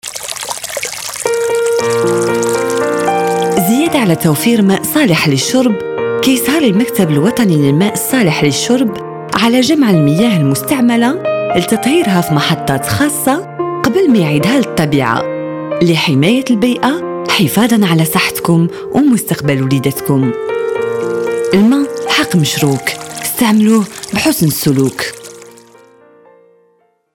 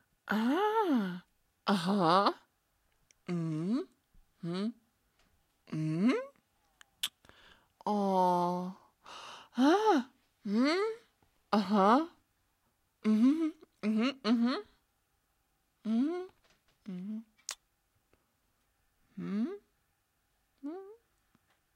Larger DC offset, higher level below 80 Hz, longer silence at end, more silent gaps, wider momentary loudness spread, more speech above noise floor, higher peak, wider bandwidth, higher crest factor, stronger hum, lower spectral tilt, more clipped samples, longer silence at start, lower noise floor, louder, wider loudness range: neither; first, -48 dBFS vs -78 dBFS; first, 1.65 s vs 0.8 s; neither; second, 7 LU vs 20 LU; about the same, 44 dB vs 47 dB; first, 0 dBFS vs -12 dBFS; first, 19 kHz vs 14 kHz; second, 12 dB vs 22 dB; neither; about the same, -5 dB/octave vs -6 dB/octave; neither; second, 0.05 s vs 0.25 s; second, -55 dBFS vs -77 dBFS; first, -12 LUFS vs -32 LUFS; second, 2 LU vs 13 LU